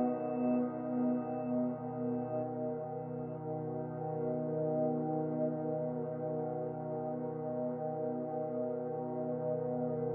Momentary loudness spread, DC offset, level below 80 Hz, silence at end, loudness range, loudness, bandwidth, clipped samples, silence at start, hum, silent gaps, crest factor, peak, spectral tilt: 5 LU; under 0.1%; -76 dBFS; 0 s; 2 LU; -37 LUFS; 2.8 kHz; under 0.1%; 0 s; none; none; 14 dB; -22 dBFS; -12 dB/octave